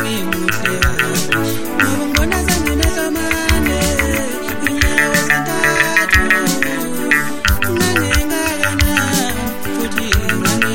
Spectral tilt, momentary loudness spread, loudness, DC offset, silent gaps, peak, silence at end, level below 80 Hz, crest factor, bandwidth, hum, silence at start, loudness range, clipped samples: -3.5 dB/octave; 6 LU; -15 LUFS; under 0.1%; none; 0 dBFS; 0 s; -24 dBFS; 16 dB; 17 kHz; none; 0 s; 2 LU; under 0.1%